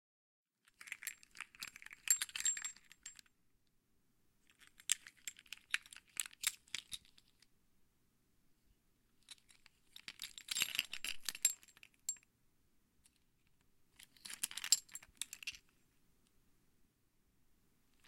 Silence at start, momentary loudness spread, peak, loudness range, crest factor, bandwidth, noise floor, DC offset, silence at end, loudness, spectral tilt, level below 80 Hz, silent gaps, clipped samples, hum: 0.8 s; 20 LU; -10 dBFS; 8 LU; 36 dB; 16.5 kHz; -77 dBFS; under 0.1%; 2.5 s; -40 LUFS; 3 dB/octave; -78 dBFS; none; under 0.1%; none